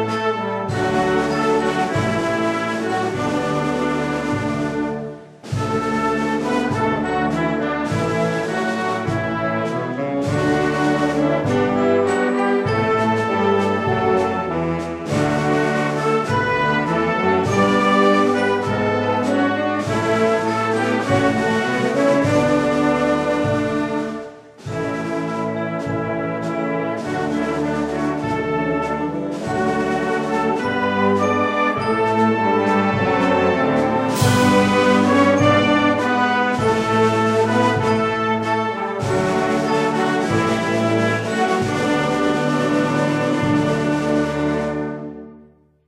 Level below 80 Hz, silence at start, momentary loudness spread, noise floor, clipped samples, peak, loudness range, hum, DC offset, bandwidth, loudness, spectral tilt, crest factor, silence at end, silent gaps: -48 dBFS; 0 s; 7 LU; -49 dBFS; under 0.1%; -2 dBFS; 6 LU; none; under 0.1%; 15.5 kHz; -19 LUFS; -6 dB/octave; 16 dB; 0.45 s; none